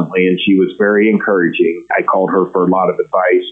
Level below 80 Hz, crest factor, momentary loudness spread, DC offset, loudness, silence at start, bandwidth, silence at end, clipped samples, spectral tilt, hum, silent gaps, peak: -60 dBFS; 10 dB; 3 LU; under 0.1%; -13 LUFS; 0 s; 3.9 kHz; 0 s; under 0.1%; -9 dB/octave; none; none; -2 dBFS